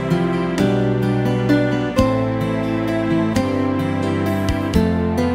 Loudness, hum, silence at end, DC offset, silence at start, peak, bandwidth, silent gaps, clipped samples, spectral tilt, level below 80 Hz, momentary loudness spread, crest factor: -19 LUFS; none; 0 s; under 0.1%; 0 s; 0 dBFS; 16 kHz; none; under 0.1%; -7.5 dB/octave; -34 dBFS; 3 LU; 18 dB